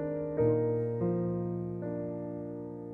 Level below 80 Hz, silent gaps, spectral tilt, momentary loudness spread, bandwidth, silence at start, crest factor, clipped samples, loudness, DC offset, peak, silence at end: -60 dBFS; none; -13 dB/octave; 11 LU; 2.8 kHz; 0 s; 16 dB; under 0.1%; -33 LUFS; under 0.1%; -18 dBFS; 0 s